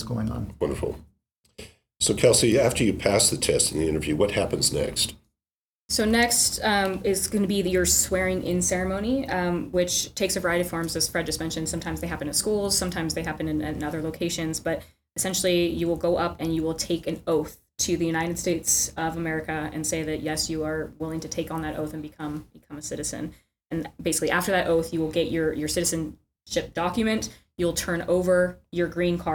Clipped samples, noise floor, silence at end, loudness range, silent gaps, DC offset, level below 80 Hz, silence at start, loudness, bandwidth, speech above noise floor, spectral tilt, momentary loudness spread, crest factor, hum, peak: under 0.1%; under -90 dBFS; 0 s; 7 LU; 1.37-1.43 s, 5.55-5.89 s; under 0.1%; -44 dBFS; 0 s; -25 LUFS; 19 kHz; over 65 dB; -3.5 dB/octave; 11 LU; 20 dB; none; -6 dBFS